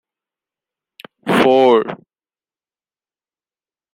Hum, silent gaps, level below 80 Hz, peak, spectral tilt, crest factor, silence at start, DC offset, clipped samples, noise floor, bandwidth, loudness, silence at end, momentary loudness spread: none; none; -62 dBFS; -2 dBFS; -6 dB/octave; 18 dB; 1.25 s; under 0.1%; under 0.1%; under -90 dBFS; 15.5 kHz; -13 LUFS; 2 s; 18 LU